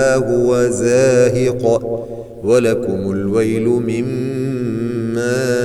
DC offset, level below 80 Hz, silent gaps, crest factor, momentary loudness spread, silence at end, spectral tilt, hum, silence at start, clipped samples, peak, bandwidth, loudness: under 0.1%; -44 dBFS; none; 12 dB; 8 LU; 0 s; -6 dB/octave; none; 0 s; under 0.1%; -2 dBFS; 13.5 kHz; -16 LUFS